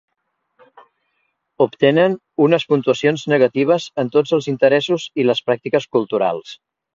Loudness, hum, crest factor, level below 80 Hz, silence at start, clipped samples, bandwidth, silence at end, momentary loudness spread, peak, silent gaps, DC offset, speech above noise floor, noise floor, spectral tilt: -17 LUFS; none; 18 dB; -64 dBFS; 1.6 s; under 0.1%; 7.6 kHz; 0.4 s; 5 LU; 0 dBFS; none; under 0.1%; 56 dB; -73 dBFS; -6 dB/octave